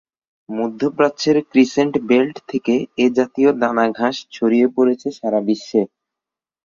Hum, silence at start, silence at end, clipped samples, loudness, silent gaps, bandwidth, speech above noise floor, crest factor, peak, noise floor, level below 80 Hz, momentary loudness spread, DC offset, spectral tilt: none; 0.5 s; 0.8 s; under 0.1%; -18 LUFS; none; 7.2 kHz; 70 dB; 16 dB; -2 dBFS; -87 dBFS; -62 dBFS; 7 LU; under 0.1%; -5.5 dB/octave